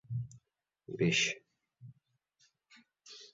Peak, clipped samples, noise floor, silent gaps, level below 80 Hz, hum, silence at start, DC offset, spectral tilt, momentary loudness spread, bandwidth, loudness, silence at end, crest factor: -18 dBFS; under 0.1%; -80 dBFS; none; -70 dBFS; none; 0.1 s; under 0.1%; -4 dB/octave; 22 LU; 7.6 kHz; -33 LUFS; 0.05 s; 22 dB